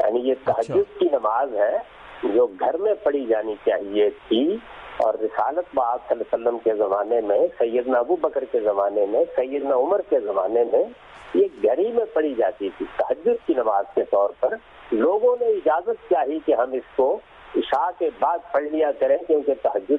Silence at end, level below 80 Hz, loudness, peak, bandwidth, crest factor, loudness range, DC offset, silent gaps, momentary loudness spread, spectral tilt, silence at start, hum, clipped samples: 0 s; -60 dBFS; -22 LUFS; -8 dBFS; 4.6 kHz; 12 dB; 1 LU; under 0.1%; none; 5 LU; -7 dB/octave; 0 s; none; under 0.1%